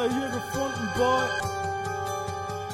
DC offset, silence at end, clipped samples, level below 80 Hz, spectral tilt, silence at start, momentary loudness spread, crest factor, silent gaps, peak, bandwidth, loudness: under 0.1%; 0 s; under 0.1%; -52 dBFS; -4.5 dB/octave; 0 s; 8 LU; 16 dB; none; -12 dBFS; 16.5 kHz; -28 LUFS